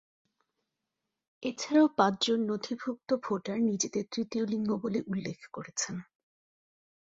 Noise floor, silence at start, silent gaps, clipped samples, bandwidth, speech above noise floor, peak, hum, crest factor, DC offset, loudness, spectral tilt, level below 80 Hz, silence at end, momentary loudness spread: -86 dBFS; 1.4 s; none; under 0.1%; 8 kHz; 56 dB; -10 dBFS; none; 22 dB; under 0.1%; -31 LUFS; -4 dB/octave; -72 dBFS; 1 s; 12 LU